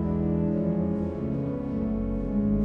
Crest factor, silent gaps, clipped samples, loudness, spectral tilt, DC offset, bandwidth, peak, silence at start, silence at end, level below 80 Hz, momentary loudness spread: 12 dB; none; under 0.1%; -28 LUFS; -12 dB/octave; under 0.1%; 3.5 kHz; -14 dBFS; 0 s; 0 s; -38 dBFS; 4 LU